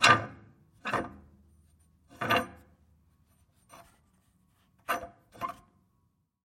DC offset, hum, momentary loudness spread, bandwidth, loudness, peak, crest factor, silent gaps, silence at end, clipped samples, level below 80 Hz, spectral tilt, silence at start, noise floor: under 0.1%; none; 23 LU; 16.5 kHz; -32 LUFS; -8 dBFS; 26 dB; none; 0.9 s; under 0.1%; -64 dBFS; -3 dB/octave; 0 s; -74 dBFS